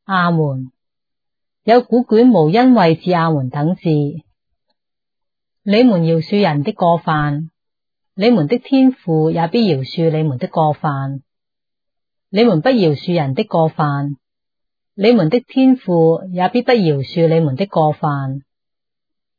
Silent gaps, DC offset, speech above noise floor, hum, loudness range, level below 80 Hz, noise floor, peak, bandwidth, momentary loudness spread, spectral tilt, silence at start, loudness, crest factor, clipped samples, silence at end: none; under 0.1%; 73 dB; none; 4 LU; -60 dBFS; -87 dBFS; 0 dBFS; 5 kHz; 11 LU; -9.5 dB/octave; 0.1 s; -15 LUFS; 14 dB; under 0.1%; 1 s